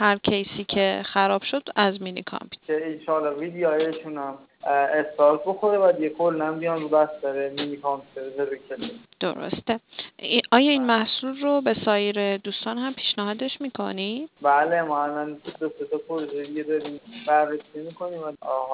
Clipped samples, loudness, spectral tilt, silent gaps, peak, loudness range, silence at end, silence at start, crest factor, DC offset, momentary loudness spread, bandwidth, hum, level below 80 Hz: under 0.1%; -24 LUFS; -8.5 dB/octave; none; -2 dBFS; 5 LU; 0 s; 0 s; 22 dB; under 0.1%; 13 LU; 4 kHz; none; -64 dBFS